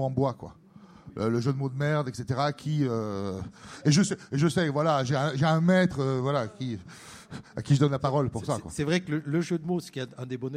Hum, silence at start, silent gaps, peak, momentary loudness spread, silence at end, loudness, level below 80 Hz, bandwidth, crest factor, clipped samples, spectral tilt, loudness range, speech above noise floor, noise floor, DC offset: none; 0 s; none; -10 dBFS; 15 LU; 0 s; -27 LUFS; -58 dBFS; 12 kHz; 18 dB; under 0.1%; -6 dB/octave; 4 LU; 23 dB; -50 dBFS; under 0.1%